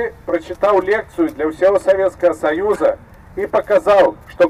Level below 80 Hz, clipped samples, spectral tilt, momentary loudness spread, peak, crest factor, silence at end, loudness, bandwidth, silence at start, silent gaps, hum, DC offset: -46 dBFS; under 0.1%; -6 dB/octave; 9 LU; -4 dBFS; 10 dB; 0 s; -16 LUFS; 13 kHz; 0 s; none; none; under 0.1%